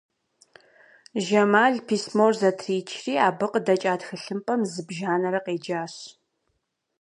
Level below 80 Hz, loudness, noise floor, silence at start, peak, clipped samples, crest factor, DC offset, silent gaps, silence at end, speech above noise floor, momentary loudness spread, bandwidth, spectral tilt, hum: -76 dBFS; -24 LUFS; -76 dBFS; 1.15 s; -4 dBFS; under 0.1%; 20 dB; under 0.1%; none; 0.9 s; 52 dB; 12 LU; 11 kHz; -5 dB/octave; none